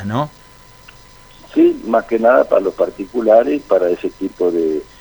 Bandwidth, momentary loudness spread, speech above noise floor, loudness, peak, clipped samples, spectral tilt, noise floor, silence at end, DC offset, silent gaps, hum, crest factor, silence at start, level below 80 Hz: over 20 kHz; 9 LU; 28 dB; -16 LUFS; 0 dBFS; under 0.1%; -7.5 dB/octave; -43 dBFS; 0.15 s; under 0.1%; none; none; 16 dB; 0 s; -48 dBFS